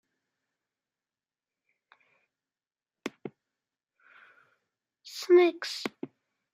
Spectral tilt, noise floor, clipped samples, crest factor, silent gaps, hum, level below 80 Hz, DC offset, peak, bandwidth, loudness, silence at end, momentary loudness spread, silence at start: -4 dB/octave; under -90 dBFS; under 0.1%; 22 dB; none; none; -88 dBFS; under 0.1%; -12 dBFS; 15 kHz; -26 LUFS; 0.5 s; 24 LU; 3.05 s